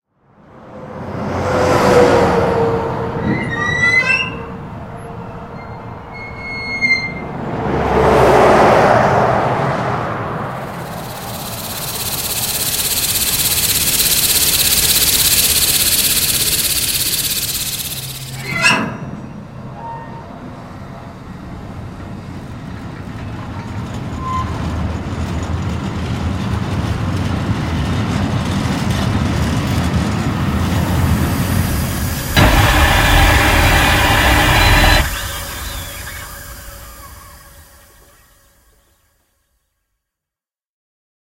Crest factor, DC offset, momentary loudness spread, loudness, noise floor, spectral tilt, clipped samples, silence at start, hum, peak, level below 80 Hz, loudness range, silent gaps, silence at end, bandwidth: 16 dB; under 0.1%; 20 LU; -14 LUFS; -88 dBFS; -3.5 dB/octave; under 0.1%; 0.55 s; none; 0 dBFS; -26 dBFS; 16 LU; none; 3.75 s; 16 kHz